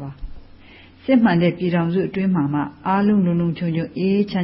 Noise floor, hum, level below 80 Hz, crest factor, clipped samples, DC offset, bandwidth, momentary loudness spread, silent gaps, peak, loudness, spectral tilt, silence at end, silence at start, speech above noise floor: -45 dBFS; none; -46 dBFS; 16 dB; under 0.1%; under 0.1%; 5.8 kHz; 7 LU; none; -4 dBFS; -19 LUFS; -12.5 dB/octave; 0 s; 0 s; 27 dB